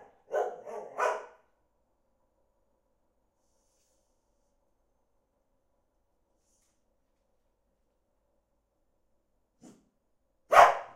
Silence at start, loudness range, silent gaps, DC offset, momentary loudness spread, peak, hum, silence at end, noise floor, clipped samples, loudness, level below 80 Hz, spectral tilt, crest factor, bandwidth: 0.3 s; 12 LU; none; under 0.1%; 21 LU; -4 dBFS; none; 0.1 s; -76 dBFS; under 0.1%; -26 LUFS; -68 dBFS; -1.5 dB/octave; 30 dB; 16 kHz